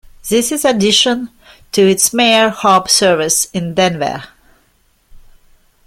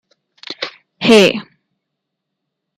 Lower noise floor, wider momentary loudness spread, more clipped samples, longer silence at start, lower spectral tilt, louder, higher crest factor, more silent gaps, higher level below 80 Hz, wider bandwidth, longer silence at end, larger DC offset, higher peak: second, -56 dBFS vs -77 dBFS; second, 10 LU vs 18 LU; neither; second, 0.25 s vs 0.5 s; second, -2.5 dB/octave vs -4 dB/octave; about the same, -12 LUFS vs -11 LUFS; about the same, 14 dB vs 18 dB; neither; first, -48 dBFS vs -58 dBFS; first, 16.5 kHz vs 14.5 kHz; second, 0.7 s vs 1.35 s; neither; about the same, 0 dBFS vs 0 dBFS